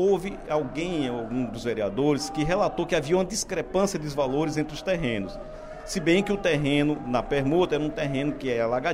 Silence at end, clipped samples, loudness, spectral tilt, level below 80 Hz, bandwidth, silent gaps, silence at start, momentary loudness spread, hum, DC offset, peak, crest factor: 0 s; under 0.1%; -26 LUFS; -5 dB/octave; -44 dBFS; 15.5 kHz; none; 0 s; 6 LU; none; under 0.1%; -8 dBFS; 16 dB